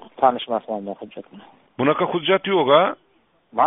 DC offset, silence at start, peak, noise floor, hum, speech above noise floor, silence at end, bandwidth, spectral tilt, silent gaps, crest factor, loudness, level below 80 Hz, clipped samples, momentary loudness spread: under 0.1%; 0.2 s; -2 dBFS; -57 dBFS; none; 37 dB; 0 s; 3.9 kHz; -3 dB/octave; none; 20 dB; -20 LUFS; -66 dBFS; under 0.1%; 20 LU